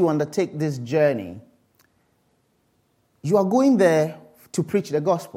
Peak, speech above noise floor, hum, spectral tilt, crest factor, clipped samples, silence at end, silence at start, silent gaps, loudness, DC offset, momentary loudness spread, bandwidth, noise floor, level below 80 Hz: -6 dBFS; 46 dB; none; -7 dB/octave; 18 dB; under 0.1%; 0 s; 0 s; none; -21 LUFS; under 0.1%; 13 LU; 16 kHz; -66 dBFS; -70 dBFS